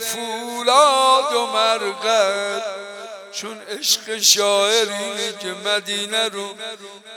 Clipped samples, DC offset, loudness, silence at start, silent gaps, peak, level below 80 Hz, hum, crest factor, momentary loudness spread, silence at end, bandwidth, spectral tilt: under 0.1%; under 0.1%; -18 LUFS; 0 s; none; 0 dBFS; -84 dBFS; none; 20 dB; 17 LU; 0 s; 18 kHz; 0 dB/octave